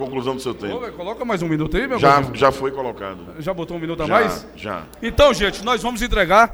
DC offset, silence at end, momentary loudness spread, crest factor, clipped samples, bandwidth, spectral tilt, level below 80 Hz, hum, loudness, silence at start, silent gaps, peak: under 0.1%; 0 s; 14 LU; 18 dB; under 0.1%; over 20 kHz; -5 dB/octave; -34 dBFS; none; -20 LUFS; 0 s; none; -2 dBFS